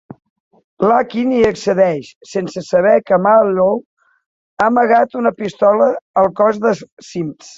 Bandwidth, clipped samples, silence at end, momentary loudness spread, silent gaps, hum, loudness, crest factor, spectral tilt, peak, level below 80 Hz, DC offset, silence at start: 7.8 kHz; under 0.1%; 0.1 s; 12 LU; 2.15-2.21 s, 3.86-3.97 s, 4.26-4.57 s, 6.02-6.14 s, 6.92-6.97 s; none; -15 LUFS; 14 dB; -6.5 dB/octave; -2 dBFS; -52 dBFS; under 0.1%; 0.8 s